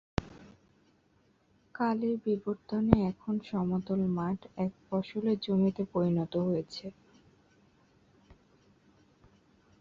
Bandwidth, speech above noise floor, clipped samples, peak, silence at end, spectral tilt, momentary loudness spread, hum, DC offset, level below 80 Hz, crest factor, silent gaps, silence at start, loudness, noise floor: 7.4 kHz; 38 dB; under 0.1%; -4 dBFS; 1.45 s; -8.5 dB/octave; 11 LU; none; under 0.1%; -54 dBFS; 30 dB; none; 0.2 s; -32 LUFS; -68 dBFS